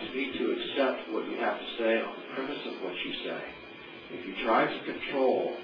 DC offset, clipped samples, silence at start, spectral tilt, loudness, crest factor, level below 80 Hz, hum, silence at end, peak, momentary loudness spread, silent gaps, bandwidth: under 0.1%; under 0.1%; 0 s; -6.5 dB/octave; -31 LUFS; 18 dB; -66 dBFS; none; 0 s; -12 dBFS; 13 LU; none; 5.4 kHz